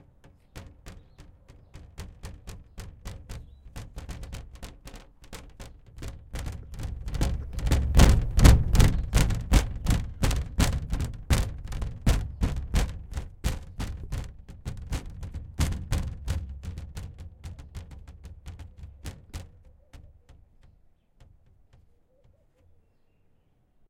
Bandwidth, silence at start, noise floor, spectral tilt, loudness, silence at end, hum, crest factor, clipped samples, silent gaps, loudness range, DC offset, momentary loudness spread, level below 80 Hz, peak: 16.5 kHz; 0.55 s; -64 dBFS; -5.5 dB/octave; -28 LUFS; 3.85 s; none; 26 dB; under 0.1%; none; 23 LU; under 0.1%; 24 LU; -30 dBFS; -2 dBFS